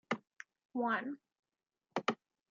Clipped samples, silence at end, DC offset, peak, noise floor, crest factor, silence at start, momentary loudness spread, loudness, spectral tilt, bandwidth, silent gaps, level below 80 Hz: under 0.1%; 0.35 s; under 0.1%; -20 dBFS; -88 dBFS; 22 dB; 0.1 s; 17 LU; -39 LUFS; -2.5 dB/octave; 7.4 kHz; 0.65-0.69 s, 1.39-1.43 s; under -90 dBFS